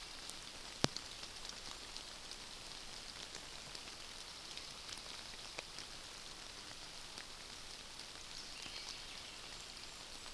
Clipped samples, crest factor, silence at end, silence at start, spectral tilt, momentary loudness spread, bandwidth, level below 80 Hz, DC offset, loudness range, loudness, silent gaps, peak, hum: under 0.1%; 42 dB; 0 s; 0 s; -2 dB/octave; 3 LU; 11 kHz; -62 dBFS; under 0.1%; 3 LU; -47 LUFS; none; -8 dBFS; none